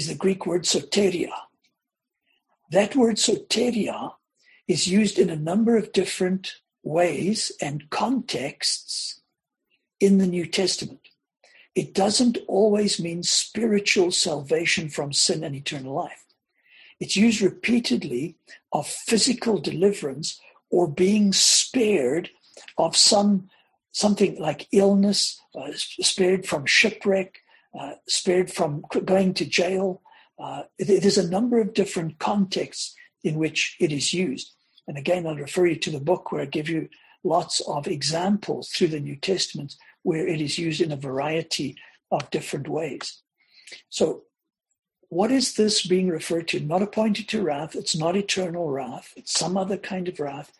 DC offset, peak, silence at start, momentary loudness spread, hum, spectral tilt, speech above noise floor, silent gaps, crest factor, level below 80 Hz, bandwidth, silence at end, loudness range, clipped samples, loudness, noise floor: under 0.1%; -4 dBFS; 0 s; 12 LU; none; -3.5 dB/octave; 61 dB; none; 20 dB; -64 dBFS; 12.5 kHz; 0.15 s; 5 LU; under 0.1%; -23 LUFS; -84 dBFS